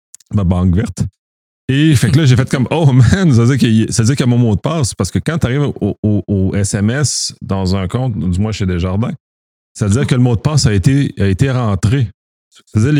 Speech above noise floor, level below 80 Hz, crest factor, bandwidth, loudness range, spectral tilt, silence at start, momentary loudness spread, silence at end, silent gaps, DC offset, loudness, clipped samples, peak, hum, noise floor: over 78 dB; -34 dBFS; 14 dB; 15 kHz; 5 LU; -6 dB/octave; 0.3 s; 8 LU; 0 s; 1.19-1.68 s, 5.98-6.03 s, 9.20-9.75 s, 12.14-12.51 s; under 0.1%; -14 LUFS; under 0.1%; 0 dBFS; none; under -90 dBFS